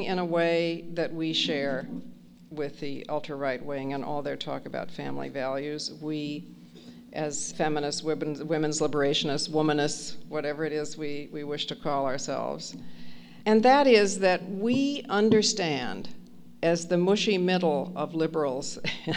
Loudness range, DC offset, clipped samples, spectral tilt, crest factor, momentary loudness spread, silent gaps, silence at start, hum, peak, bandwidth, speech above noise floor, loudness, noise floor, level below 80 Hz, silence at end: 10 LU; under 0.1%; under 0.1%; -4.5 dB/octave; 20 dB; 13 LU; none; 0 s; none; -8 dBFS; 11 kHz; 21 dB; -28 LUFS; -48 dBFS; -62 dBFS; 0 s